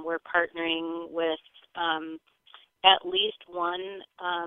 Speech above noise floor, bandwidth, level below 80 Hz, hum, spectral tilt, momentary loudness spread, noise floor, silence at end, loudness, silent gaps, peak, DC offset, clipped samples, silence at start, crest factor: 26 dB; 4 kHz; -70 dBFS; none; -5.5 dB/octave; 17 LU; -55 dBFS; 0 s; -27 LUFS; none; -4 dBFS; under 0.1%; under 0.1%; 0 s; 26 dB